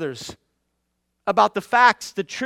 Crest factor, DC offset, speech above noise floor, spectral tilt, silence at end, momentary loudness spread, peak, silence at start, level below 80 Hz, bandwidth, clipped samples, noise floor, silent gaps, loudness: 20 dB; under 0.1%; 54 dB; -3.5 dB/octave; 0 s; 17 LU; -2 dBFS; 0 s; -64 dBFS; 15.5 kHz; under 0.1%; -74 dBFS; none; -19 LUFS